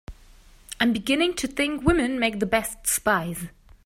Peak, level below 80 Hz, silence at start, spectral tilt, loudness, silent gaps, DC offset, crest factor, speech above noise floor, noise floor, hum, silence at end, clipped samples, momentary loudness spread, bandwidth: -4 dBFS; -42 dBFS; 0.1 s; -3.5 dB/octave; -24 LUFS; none; under 0.1%; 20 dB; 27 dB; -51 dBFS; none; 0.35 s; under 0.1%; 11 LU; 16 kHz